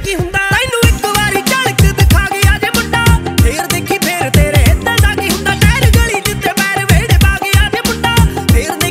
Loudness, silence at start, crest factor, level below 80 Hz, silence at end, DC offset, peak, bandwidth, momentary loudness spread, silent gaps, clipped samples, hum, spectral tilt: -11 LUFS; 0 s; 10 dB; -16 dBFS; 0 s; under 0.1%; 0 dBFS; 16.5 kHz; 4 LU; none; under 0.1%; none; -4.5 dB/octave